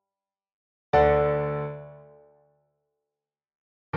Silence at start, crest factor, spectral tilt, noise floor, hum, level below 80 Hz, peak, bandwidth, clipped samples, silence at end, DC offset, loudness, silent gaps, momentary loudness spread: 0.95 s; 20 dB; -5.5 dB/octave; under -90 dBFS; none; -46 dBFS; -8 dBFS; 6.6 kHz; under 0.1%; 0 s; under 0.1%; -24 LUFS; 3.55-3.93 s; 15 LU